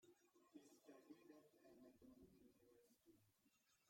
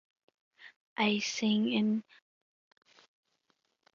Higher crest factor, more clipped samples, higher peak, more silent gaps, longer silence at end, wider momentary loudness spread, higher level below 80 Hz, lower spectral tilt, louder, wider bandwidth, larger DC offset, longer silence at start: about the same, 18 dB vs 20 dB; neither; second, -52 dBFS vs -14 dBFS; second, none vs 0.76-0.96 s; second, 0 s vs 1.95 s; second, 2 LU vs 7 LU; second, under -90 dBFS vs -82 dBFS; about the same, -5 dB/octave vs -4 dB/octave; second, -69 LUFS vs -31 LUFS; first, 16 kHz vs 7.4 kHz; neither; second, 0 s vs 0.6 s